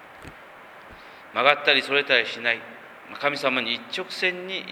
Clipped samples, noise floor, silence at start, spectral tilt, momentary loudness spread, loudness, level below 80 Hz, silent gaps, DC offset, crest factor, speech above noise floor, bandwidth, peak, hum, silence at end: under 0.1%; -45 dBFS; 0 s; -3 dB/octave; 24 LU; -23 LUFS; -64 dBFS; none; under 0.1%; 26 dB; 22 dB; 19.5 kHz; 0 dBFS; none; 0 s